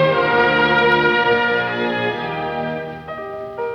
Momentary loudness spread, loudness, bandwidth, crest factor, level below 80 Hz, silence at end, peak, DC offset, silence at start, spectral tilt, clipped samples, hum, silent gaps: 15 LU; -17 LUFS; 7 kHz; 14 dB; -50 dBFS; 0 s; -4 dBFS; under 0.1%; 0 s; -6.5 dB/octave; under 0.1%; none; none